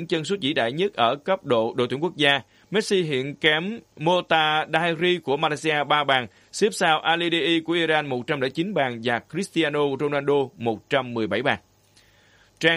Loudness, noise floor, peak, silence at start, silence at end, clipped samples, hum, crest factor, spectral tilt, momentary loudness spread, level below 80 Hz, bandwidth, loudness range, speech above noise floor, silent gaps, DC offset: -23 LUFS; -58 dBFS; -4 dBFS; 0 s; 0 s; under 0.1%; none; 20 dB; -4.5 dB/octave; 6 LU; -66 dBFS; 13 kHz; 3 LU; 35 dB; none; under 0.1%